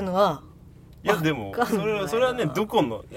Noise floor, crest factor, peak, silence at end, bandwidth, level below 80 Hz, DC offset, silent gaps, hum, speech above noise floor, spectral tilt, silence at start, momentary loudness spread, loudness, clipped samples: -48 dBFS; 20 dB; -6 dBFS; 0 s; 16.5 kHz; -52 dBFS; under 0.1%; none; none; 24 dB; -5.5 dB/octave; 0 s; 3 LU; -24 LUFS; under 0.1%